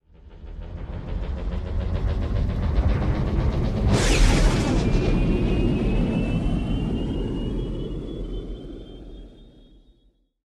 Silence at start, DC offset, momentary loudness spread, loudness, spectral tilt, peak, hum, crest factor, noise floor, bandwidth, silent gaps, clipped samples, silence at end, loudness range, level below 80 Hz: 0.25 s; under 0.1%; 18 LU; -25 LUFS; -6 dB/octave; -6 dBFS; none; 18 dB; -62 dBFS; 12 kHz; none; under 0.1%; 1 s; 9 LU; -26 dBFS